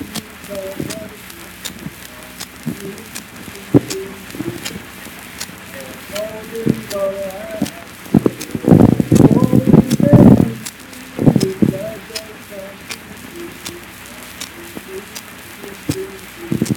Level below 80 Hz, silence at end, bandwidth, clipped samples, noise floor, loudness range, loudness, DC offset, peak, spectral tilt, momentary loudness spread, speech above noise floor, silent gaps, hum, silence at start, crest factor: -40 dBFS; 0 s; 19 kHz; 0.3%; -35 dBFS; 17 LU; -16 LUFS; under 0.1%; 0 dBFS; -6.5 dB/octave; 21 LU; 12 dB; none; none; 0 s; 18 dB